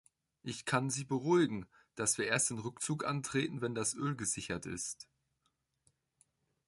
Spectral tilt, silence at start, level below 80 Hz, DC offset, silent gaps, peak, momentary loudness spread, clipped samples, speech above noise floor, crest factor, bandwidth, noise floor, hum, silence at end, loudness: -4 dB/octave; 0.45 s; -68 dBFS; under 0.1%; none; -16 dBFS; 12 LU; under 0.1%; 46 dB; 20 dB; 12 kHz; -81 dBFS; none; 1.65 s; -35 LUFS